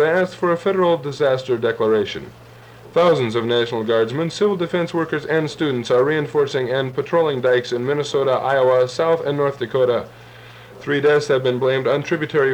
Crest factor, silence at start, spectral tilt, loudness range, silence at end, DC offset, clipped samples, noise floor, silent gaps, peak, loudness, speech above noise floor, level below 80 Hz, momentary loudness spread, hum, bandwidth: 12 dB; 0 s; -6 dB/octave; 1 LU; 0 s; under 0.1%; under 0.1%; -42 dBFS; none; -6 dBFS; -19 LUFS; 23 dB; -58 dBFS; 5 LU; none; 10 kHz